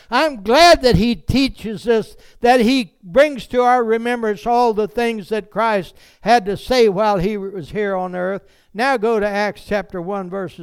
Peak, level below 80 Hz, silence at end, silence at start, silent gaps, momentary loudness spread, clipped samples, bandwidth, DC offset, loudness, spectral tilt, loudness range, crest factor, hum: -2 dBFS; -38 dBFS; 0 s; 0.1 s; none; 12 LU; under 0.1%; 18 kHz; under 0.1%; -17 LUFS; -5 dB/octave; 4 LU; 14 dB; none